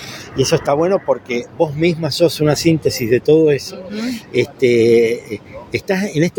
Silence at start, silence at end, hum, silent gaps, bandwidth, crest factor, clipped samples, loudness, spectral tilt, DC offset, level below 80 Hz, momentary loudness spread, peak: 0 s; 0.1 s; none; none; 17 kHz; 14 dB; under 0.1%; -16 LUFS; -5.5 dB/octave; under 0.1%; -48 dBFS; 12 LU; -2 dBFS